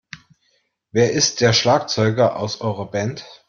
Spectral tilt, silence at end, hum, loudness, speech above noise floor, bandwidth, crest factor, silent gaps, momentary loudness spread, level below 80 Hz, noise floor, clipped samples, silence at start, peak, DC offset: -4 dB/octave; 0.15 s; none; -18 LUFS; 47 dB; 7.4 kHz; 18 dB; none; 10 LU; -56 dBFS; -66 dBFS; under 0.1%; 0.15 s; -2 dBFS; under 0.1%